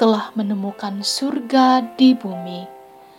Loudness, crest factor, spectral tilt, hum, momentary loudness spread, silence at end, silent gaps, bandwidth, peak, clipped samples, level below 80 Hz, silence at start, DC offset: -18 LUFS; 16 dB; -4.5 dB/octave; none; 16 LU; 0.35 s; none; 13.5 kHz; -2 dBFS; under 0.1%; -74 dBFS; 0 s; under 0.1%